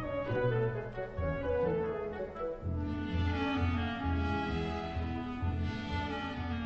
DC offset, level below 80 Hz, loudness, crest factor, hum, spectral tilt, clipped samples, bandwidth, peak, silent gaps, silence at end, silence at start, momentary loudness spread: under 0.1%; -44 dBFS; -35 LUFS; 14 dB; none; -6 dB/octave; under 0.1%; 7 kHz; -20 dBFS; none; 0 s; 0 s; 6 LU